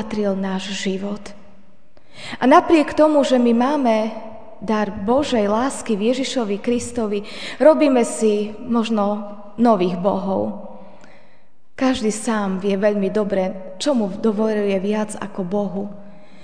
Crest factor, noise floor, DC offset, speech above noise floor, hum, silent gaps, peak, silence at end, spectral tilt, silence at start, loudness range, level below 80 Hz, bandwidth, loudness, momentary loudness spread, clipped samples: 20 dB; -58 dBFS; 2%; 40 dB; none; none; 0 dBFS; 0.35 s; -5.5 dB/octave; 0 s; 5 LU; -52 dBFS; 10 kHz; -19 LUFS; 13 LU; under 0.1%